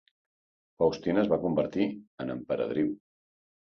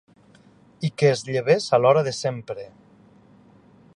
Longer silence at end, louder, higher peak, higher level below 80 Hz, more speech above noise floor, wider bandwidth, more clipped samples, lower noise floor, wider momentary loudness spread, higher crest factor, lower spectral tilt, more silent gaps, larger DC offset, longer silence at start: second, 0.8 s vs 1.3 s; second, -29 LUFS vs -21 LUFS; second, -14 dBFS vs -6 dBFS; about the same, -62 dBFS vs -66 dBFS; first, over 62 dB vs 33 dB; second, 6.8 kHz vs 11.5 kHz; neither; first, under -90 dBFS vs -54 dBFS; second, 11 LU vs 18 LU; about the same, 18 dB vs 20 dB; first, -7.5 dB/octave vs -5.5 dB/octave; first, 2.07-2.18 s vs none; neither; about the same, 0.8 s vs 0.8 s